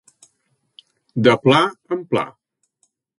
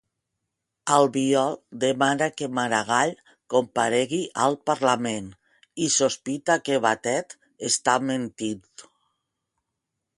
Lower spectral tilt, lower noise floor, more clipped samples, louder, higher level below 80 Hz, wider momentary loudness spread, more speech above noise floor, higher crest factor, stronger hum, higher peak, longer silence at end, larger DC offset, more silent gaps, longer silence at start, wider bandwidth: first, -6 dB/octave vs -3 dB/octave; second, -69 dBFS vs -82 dBFS; neither; first, -18 LUFS vs -24 LUFS; first, -62 dBFS vs -68 dBFS; first, 15 LU vs 10 LU; second, 52 dB vs 59 dB; about the same, 22 dB vs 22 dB; neither; first, 0 dBFS vs -4 dBFS; second, 0.9 s vs 1.35 s; neither; neither; first, 1.15 s vs 0.85 s; about the same, 11.5 kHz vs 11.5 kHz